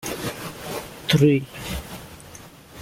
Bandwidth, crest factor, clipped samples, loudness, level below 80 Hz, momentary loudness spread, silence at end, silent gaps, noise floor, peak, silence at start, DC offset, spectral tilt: 16.5 kHz; 20 dB; under 0.1%; -24 LUFS; -44 dBFS; 24 LU; 0 s; none; -44 dBFS; -4 dBFS; 0 s; under 0.1%; -5.5 dB/octave